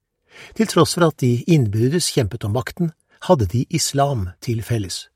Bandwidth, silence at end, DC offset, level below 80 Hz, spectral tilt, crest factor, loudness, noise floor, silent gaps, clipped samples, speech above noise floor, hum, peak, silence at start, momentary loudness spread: 16 kHz; 0.1 s; under 0.1%; -46 dBFS; -5.5 dB/octave; 18 dB; -19 LUFS; -46 dBFS; none; under 0.1%; 27 dB; none; -2 dBFS; 0.35 s; 9 LU